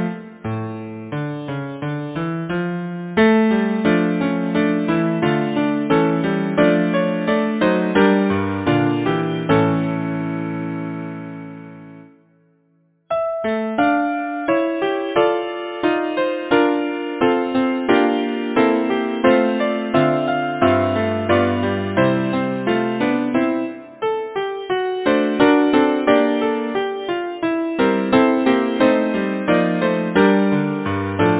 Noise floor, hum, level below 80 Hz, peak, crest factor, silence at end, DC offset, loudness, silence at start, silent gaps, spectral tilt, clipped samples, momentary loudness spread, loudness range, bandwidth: -61 dBFS; none; -50 dBFS; 0 dBFS; 18 dB; 0 s; under 0.1%; -19 LUFS; 0 s; none; -10.5 dB/octave; under 0.1%; 10 LU; 5 LU; 4 kHz